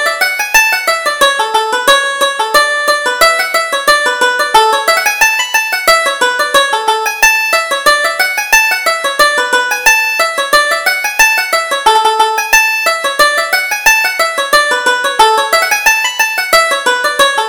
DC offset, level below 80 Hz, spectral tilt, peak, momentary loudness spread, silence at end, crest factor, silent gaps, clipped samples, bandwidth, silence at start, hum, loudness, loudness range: under 0.1%; -44 dBFS; 1.5 dB/octave; 0 dBFS; 4 LU; 0 s; 10 dB; none; 0.2%; over 20 kHz; 0 s; none; -9 LUFS; 1 LU